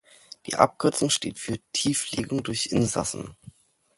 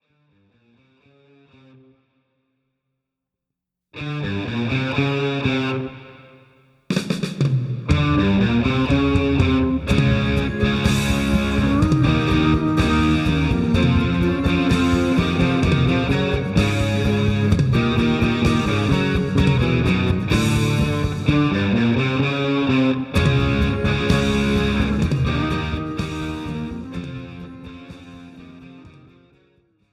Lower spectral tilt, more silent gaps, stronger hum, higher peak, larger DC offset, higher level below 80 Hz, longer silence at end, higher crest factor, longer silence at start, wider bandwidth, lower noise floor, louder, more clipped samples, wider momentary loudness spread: second, -3.5 dB/octave vs -6.5 dB/octave; neither; neither; about the same, 0 dBFS vs -2 dBFS; neither; second, -56 dBFS vs -32 dBFS; second, 0.65 s vs 1.05 s; first, 26 dB vs 18 dB; second, 0.45 s vs 3.95 s; second, 12 kHz vs 14.5 kHz; second, -52 dBFS vs -83 dBFS; second, -25 LUFS vs -19 LUFS; neither; about the same, 11 LU vs 9 LU